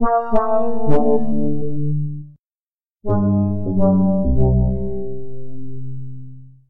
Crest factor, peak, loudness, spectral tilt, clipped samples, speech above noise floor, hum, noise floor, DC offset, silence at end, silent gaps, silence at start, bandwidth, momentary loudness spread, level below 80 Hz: 14 dB; -2 dBFS; -19 LUFS; -12.5 dB/octave; under 0.1%; over 75 dB; none; under -90 dBFS; 6%; 0 s; 2.39-2.96 s; 0 s; 3.1 kHz; 17 LU; -30 dBFS